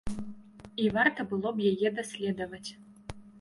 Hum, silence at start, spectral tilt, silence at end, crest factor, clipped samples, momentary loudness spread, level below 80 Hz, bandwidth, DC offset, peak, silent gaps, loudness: none; 0.05 s; -5.5 dB/octave; 0 s; 22 dB; under 0.1%; 21 LU; -54 dBFS; 11.5 kHz; under 0.1%; -10 dBFS; none; -30 LUFS